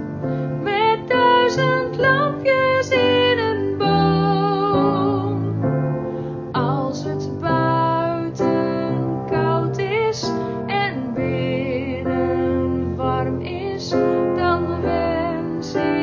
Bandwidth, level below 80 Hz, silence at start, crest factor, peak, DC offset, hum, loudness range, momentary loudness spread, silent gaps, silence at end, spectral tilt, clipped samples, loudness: 7.4 kHz; -42 dBFS; 0 s; 14 dB; -6 dBFS; under 0.1%; none; 5 LU; 7 LU; none; 0 s; -6.5 dB/octave; under 0.1%; -20 LUFS